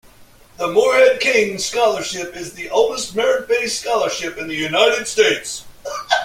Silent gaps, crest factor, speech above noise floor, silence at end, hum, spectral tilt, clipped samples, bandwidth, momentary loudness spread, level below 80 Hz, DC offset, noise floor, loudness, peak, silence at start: none; 16 dB; 29 dB; 0 s; none; -2 dB/octave; under 0.1%; 16 kHz; 15 LU; -52 dBFS; under 0.1%; -46 dBFS; -17 LUFS; -2 dBFS; 0.2 s